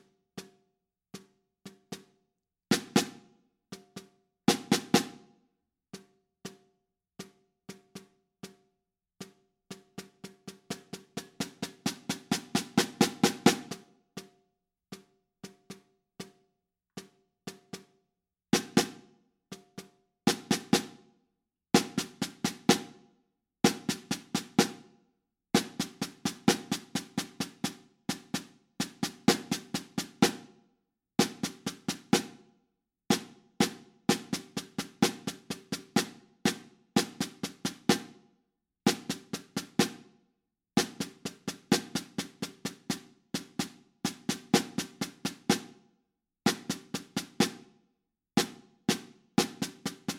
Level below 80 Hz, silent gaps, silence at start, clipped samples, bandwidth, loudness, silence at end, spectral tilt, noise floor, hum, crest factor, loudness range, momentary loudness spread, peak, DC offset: -72 dBFS; none; 0.35 s; under 0.1%; 17 kHz; -32 LUFS; 0 s; -3.5 dB/octave; -84 dBFS; none; 30 dB; 18 LU; 22 LU; -4 dBFS; under 0.1%